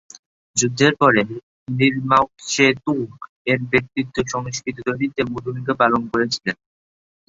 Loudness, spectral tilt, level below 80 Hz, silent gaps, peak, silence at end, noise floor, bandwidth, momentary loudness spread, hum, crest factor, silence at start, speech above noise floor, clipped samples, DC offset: -20 LUFS; -4 dB/octave; -54 dBFS; 1.43-1.66 s, 3.29-3.45 s; -2 dBFS; 0.75 s; under -90 dBFS; 8 kHz; 11 LU; none; 20 dB; 0.55 s; over 70 dB; under 0.1%; under 0.1%